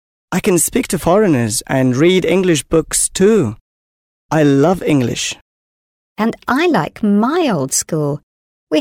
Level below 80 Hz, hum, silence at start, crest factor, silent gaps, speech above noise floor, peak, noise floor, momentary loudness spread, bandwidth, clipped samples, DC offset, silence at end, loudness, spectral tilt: -42 dBFS; none; 0.3 s; 14 dB; 3.61-4.29 s, 5.41-6.16 s, 8.23-8.67 s; over 76 dB; -2 dBFS; under -90 dBFS; 8 LU; 17 kHz; under 0.1%; under 0.1%; 0 s; -15 LUFS; -4.5 dB/octave